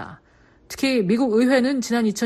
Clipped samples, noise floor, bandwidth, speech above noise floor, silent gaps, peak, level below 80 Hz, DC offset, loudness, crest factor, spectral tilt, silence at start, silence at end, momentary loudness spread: under 0.1%; -55 dBFS; 14 kHz; 35 dB; none; -6 dBFS; -58 dBFS; under 0.1%; -20 LUFS; 16 dB; -5 dB/octave; 0 s; 0 s; 13 LU